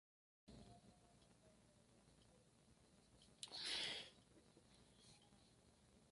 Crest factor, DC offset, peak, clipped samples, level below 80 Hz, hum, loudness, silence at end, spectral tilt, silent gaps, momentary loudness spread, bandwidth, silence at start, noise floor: 26 dB; under 0.1%; -32 dBFS; under 0.1%; -80 dBFS; none; -49 LUFS; 0 s; -1.5 dB/octave; none; 23 LU; 11.5 kHz; 0.45 s; -73 dBFS